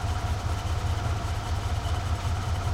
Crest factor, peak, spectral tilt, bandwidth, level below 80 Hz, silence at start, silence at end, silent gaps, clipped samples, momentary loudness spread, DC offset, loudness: 12 dB; -16 dBFS; -5.5 dB/octave; 15.5 kHz; -34 dBFS; 0 s; 0 s; none; under 0.1%; 1 LU; under 0.1%; -30 LUFS